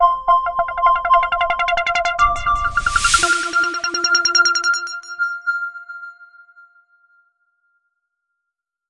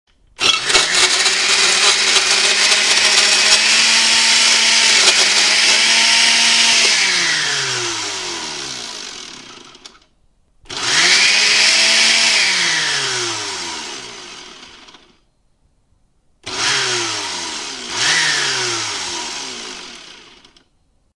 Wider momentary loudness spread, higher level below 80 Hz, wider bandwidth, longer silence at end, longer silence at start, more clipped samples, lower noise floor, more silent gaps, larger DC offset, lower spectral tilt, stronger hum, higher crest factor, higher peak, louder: second, 11 LU vs 17 LU; first, -38 dBFS vs -56 dBFS; about the same, 11.5 kHz vs 12 kHz; first, 2.65 s vs 1 s; second, 0 s vs 0.4 s; neither; first, -81 dBFS vs -59 dBFS; neither; neither; first, -1 dB/octave vs 1.5 dB/octave; neither; about the same, 18 dB vs 16 dB; about the same, 0 dBFS vs 0 dBFS; second, -17 LUFS vs -12 LUFS